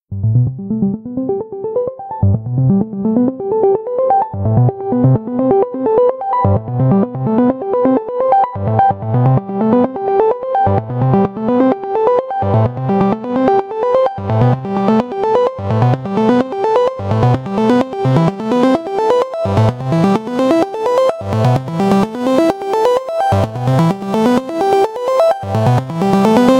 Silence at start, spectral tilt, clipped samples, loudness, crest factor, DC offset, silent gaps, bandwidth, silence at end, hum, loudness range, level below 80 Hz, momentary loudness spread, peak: 0.1 s; -8.5 dB/octave; under 0.1%; -14 LUFS; 14 dB; under 0.1%; none; 12.5 kHz; 0 s; none; 1 LU; -44 dBFS; 3 LU; 0 dBFS